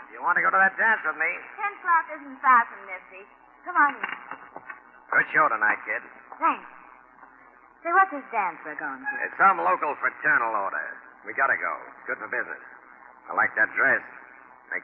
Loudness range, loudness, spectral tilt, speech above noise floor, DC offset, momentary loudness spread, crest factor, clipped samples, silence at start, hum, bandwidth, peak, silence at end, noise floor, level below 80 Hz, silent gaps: 4 LU; -24 LUFS; -1.5 dB/octave; 28 dB; under 0.1%; 18 LU; 18 dB; under 0.1%; 0 s; none; 4 kHz; -8 dBFS; 0 s; -53 dBFS; -76 dBFS; none